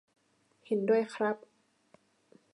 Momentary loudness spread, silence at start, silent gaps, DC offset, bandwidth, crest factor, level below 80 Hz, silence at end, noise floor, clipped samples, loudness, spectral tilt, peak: 8 LU; 0.7 s; none; under 0.1%; 10.5 kHz; 18 dB; -88 dBFS; 1.2 s; -70 dBFS; under 0.1%; -31 LUFS; -6.5 dB/octave; -18 dBFS